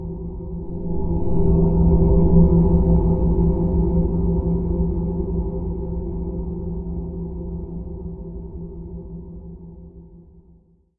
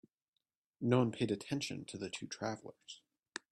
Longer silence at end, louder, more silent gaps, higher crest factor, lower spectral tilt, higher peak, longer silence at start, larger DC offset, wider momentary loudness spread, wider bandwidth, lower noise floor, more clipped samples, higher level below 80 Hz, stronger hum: first, 0.8 s vs 0.15 s; first, -21 LUFS vs -38 LUFS; neither; about the same, 18 dB vs 22 dB; first, -15.5 dB/octave vs -5.5 dB/octave; first, -2 dBFS vs -18 dBFS; second, 0 s vs 0.8 s; neither; about the same, 19 LU vs 20 LU; second, 1.4 kHz vs 12 kHz; second, -53 dBFS vs -89 dBFS; neither; first, -26 dBFS vs -76 dBFS; neither